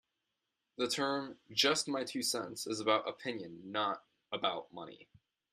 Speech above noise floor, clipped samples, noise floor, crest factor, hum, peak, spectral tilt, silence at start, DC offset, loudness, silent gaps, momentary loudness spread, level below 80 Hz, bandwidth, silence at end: 50 dB; under 0.1%; -87 dBFS; 24 dB; none; -14 dBFS; -2 dB/octave; 0.8 s; under 0.1%; -35 LUFS; none; 15 LU; -82 dBFS; 14 kHz; 0.5 s